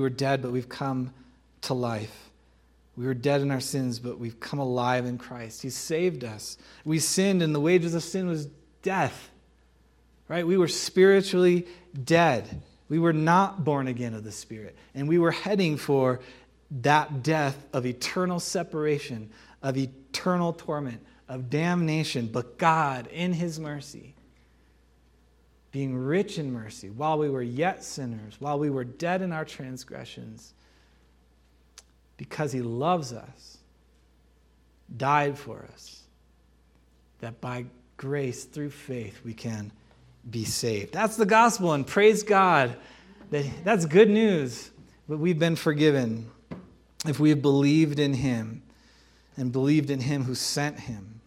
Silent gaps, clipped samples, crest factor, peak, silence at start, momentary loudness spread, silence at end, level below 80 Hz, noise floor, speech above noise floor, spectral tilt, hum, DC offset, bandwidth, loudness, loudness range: none; under 0.1%; 22 dB; -4 dBFS; 0 s; 19 LU; 0.05 s; -60 dBFS; -61 dBFS; 35 dB; -5.5 dB/octave; none; under 0.1%; 16 kHz; -26 LUFS; 11 LU